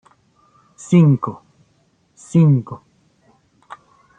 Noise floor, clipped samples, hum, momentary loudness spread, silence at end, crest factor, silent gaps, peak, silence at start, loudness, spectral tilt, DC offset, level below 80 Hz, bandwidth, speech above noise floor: -60 dBFS; under 0.1%; none; 23 LU; 1.4 s; 18 dB; none; -2 dBFS; 0.9 s; -16 LUFS; -8.5 dB/octave; under 0.1%; -62 dBFS; 9 kHz; 46 dB